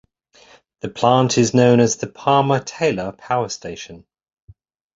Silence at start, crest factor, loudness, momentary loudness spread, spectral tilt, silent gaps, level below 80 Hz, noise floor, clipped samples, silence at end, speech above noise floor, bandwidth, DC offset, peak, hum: 0.85 s; 18 dB; -18 LUFS; 18 LU; -5 dB/octave; none; -54 dBFS; -51 dBFS; under 0.1%; 1 s; 34 dB; 7.8 kHz; under 0.1%; -2 dBFS; none